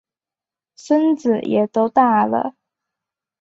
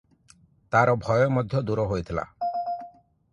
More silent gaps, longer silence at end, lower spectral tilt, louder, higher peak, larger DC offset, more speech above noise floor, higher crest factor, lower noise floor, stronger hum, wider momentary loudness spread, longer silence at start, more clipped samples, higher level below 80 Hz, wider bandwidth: neither; first, 0.9 s vs 0.45 s; about the same, -7 dB/octave vs -7.5 dB/octave; first, -17 LUFS vs -25 LUFS; first, -2 dBFS vs -6 dBFS; neither; first, 73 dB vs 35 dB; about the same, 18 dB vs 20 dB; first, -90 dBFS vs -58 dBFS; neither; second, 6 LU vs 11 LU; first, 0.85 s vs 0.7 s; neither; second, -64 dBFS vs -50 dBFS; second, 8 kHz vs 10 kHz